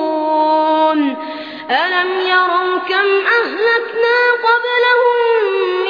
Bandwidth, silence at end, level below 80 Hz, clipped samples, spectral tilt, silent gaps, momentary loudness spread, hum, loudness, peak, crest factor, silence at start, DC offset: 5.2 kHz; 0 s; -70 dBFS; under 0.1%; -4 dB/octave; none; 5 LU; none; -14 LUFS; 0 dBFS; 14 dB; 0 s; 0.1%